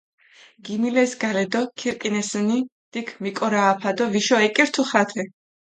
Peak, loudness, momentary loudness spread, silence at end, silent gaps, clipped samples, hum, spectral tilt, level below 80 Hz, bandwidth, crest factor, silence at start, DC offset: -2 dBFS; -22 LUFS; 13 LU; 0.45 s; 2.72-2.92 s; under 0.1%; none; -4 dB/octave; -70 dBFS; 9.4 kHz; 22 dB; 0.65 s; under 0.1%